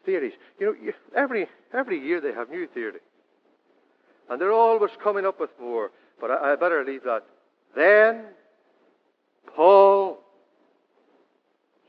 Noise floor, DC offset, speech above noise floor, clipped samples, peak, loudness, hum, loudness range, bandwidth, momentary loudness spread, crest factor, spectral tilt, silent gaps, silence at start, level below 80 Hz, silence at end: -69 dBFS; under 0.1%; 47 dB; under 0.1%; -4 dBFS; -22 LUFS; none; 8 LU; 5.4 kHz; 18 LU; 20 dB; -7.5 dB/octave; none; 0.05 s; under -90 dBFS; 1.7 s